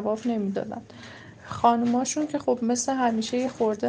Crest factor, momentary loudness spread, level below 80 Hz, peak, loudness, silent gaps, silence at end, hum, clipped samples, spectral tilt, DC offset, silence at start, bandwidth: 18 dB; 19 LU; -62 dBFS; -8 dBFS; -25 LUFS; none; 0 s; none; under 0.1%; -4.5 dB/octave; under 0.1%; 0 s; 10.5 kHz